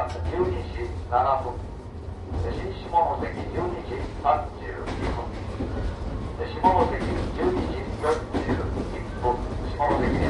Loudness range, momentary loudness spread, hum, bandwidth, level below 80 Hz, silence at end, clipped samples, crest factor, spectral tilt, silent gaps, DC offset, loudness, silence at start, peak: 2 LU; 10 LU; none; 11.5 kHz; -34 dBFS; 0 s; under 0.1%; 20 dB; -7.5 dB/octave; none; under 0.1%; -27 LUFS; 0 s; -6 dBFS